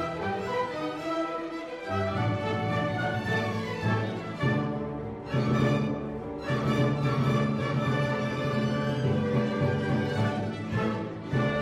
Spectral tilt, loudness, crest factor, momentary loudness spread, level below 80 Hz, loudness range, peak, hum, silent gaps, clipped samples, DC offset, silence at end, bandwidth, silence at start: -7.5 dB/octave; -29 LUFS; 14 dB; 7 LU; -52 dBFS; 3 LU; -14 dBFS; none; none; under 0.1%; under 0.1%; 0 s; 11.5 kHz; 0 s